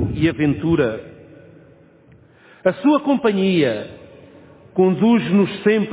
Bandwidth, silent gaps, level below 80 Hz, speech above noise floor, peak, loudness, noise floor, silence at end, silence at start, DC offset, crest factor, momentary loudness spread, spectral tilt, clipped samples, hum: 4 kHz; none; -44 dBFS; 33 dB; -2 dBFS; -18 LUFS; -49 dBFS; 0 s; 0 s; under 0.1%; 16 dB; 8 LU; -11.5 dB/octave; under 0.1%; none